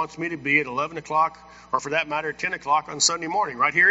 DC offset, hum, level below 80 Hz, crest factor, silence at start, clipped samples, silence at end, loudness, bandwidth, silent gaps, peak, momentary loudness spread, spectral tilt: under 0.1%; none; -62 dBFS; 20 dB; 0 s; under 0.1%; 0 s; -23 LUFS; 8 kHz; none; -4 dBFS; 8 LU; -1 dB/octave